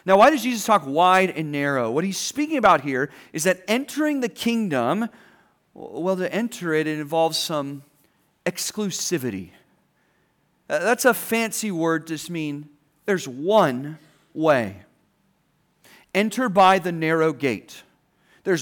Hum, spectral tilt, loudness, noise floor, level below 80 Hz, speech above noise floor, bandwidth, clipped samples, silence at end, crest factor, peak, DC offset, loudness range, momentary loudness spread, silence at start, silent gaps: none; -4 dB/octave; -22 LUFS; -66 dBFS; -66 dBFS; 45 dB; over 20 kHz; under 0.1%; 0 s; 18 dB; -6 dBFS; under 0.1%; 5 LU; 14 LU; 0.05 s; none